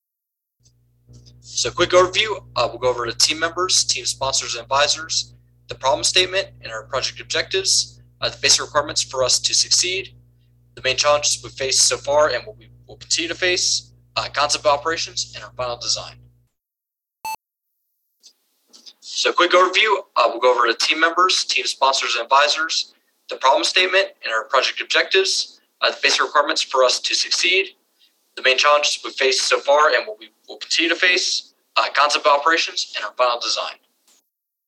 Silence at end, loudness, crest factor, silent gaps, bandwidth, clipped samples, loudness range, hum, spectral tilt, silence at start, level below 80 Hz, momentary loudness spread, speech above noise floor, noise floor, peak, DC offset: 0.95 s; -18 LUFS; 20 dB; none; 16 kHz; under 0.1%; 4 LU; none; -0.5 dB/octave; 1.45 s; -54 dBFS; 11 LU; 65 dB; -84 dBFS; 0 dBFS; under 0.1%